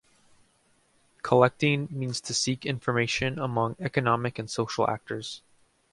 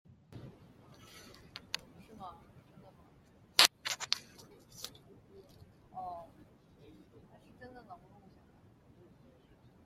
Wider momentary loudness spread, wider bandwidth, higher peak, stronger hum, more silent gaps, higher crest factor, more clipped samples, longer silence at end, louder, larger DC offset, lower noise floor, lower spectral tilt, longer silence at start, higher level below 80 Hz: second, 12 LU vs 30 LU; second, 11.5 kHz vs 16 kHz; second, -4 dBFS vs 0 dBFS; neither; neither; second, 24 dB vs 42 dB; neither; second, 0.55 s vs 1.9 s; first, -27 LUFS vs -33 LUFS; neither; about the same, -66 dBFS vs -63 dBFS; first, -4.5 dB/octave vs 0 dB/octave; first, 1.25 s vs 0.3 s; first, -60 dBFS vs -72 dBFS